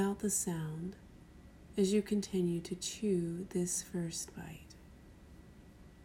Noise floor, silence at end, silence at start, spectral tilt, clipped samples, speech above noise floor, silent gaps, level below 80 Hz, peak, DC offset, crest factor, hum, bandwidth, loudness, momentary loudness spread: -57 dBFS; 0 s; 0 s; -5 dB/octave; under 0.1%; 21 dB; none; -60 dBFS; -20 dBFS; under 0.1%; 16 dB; none; 16 kHz; -36 LUFS; 24 LU